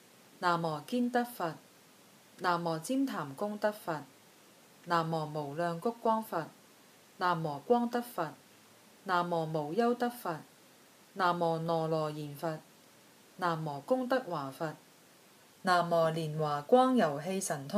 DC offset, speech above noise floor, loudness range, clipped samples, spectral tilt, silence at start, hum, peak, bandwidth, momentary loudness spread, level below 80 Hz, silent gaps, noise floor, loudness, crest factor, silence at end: under 0.1%; 28 dB; 5 LU; under 0.1%; -5.5 dB/octave; 0.4 s; none; -14 dBFS; 15 kHz; 10 LU; -82 dBFS; none; -60 dBFS; -33 LUFS; 20 dB; 0 s